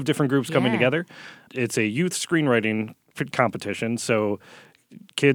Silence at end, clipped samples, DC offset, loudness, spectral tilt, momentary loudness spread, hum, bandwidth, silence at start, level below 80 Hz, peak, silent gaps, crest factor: 0 s; under 0.1%; under 0.1%; -24 LUFS; -5 dB/octave; 13 LU; none; 19.5 kHz; 0 s; -70 dBFS; -2 dBFS; none; 22 dB